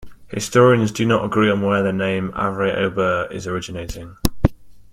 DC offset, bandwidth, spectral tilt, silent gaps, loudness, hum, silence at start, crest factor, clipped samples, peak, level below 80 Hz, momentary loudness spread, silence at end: under 0.1%; 16.5 kHz; -6 dB/octave; none; -19 LUFS; none; 0 s; 20 dB; under 0.1%; 0 dBFS; -36 dBFS; 12 LU; 0 s